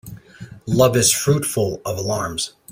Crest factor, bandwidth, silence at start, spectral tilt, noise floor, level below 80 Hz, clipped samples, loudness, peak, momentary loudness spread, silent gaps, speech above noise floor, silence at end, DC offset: 18 dB; 16 kHz; 0.05 s; -4 dB/octave; -40 dBFS; -50 dBFS; under 0.1%; -19 LUFS; -2 dBFS; 12 LU; none; 21 dB; 0 s; under 0.1%